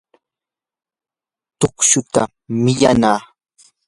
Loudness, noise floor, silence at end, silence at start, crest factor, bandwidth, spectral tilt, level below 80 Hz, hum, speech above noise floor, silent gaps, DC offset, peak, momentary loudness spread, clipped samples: -16 LUFS; -90 dBFS; 0.65 s; 1.6 s; 18 dB; 11.5 kHz; -4 dB/octave; -48 dBFS; none; 74 dB; none; under 0.1%; 0 dBFS; 8 LU; under 0.1%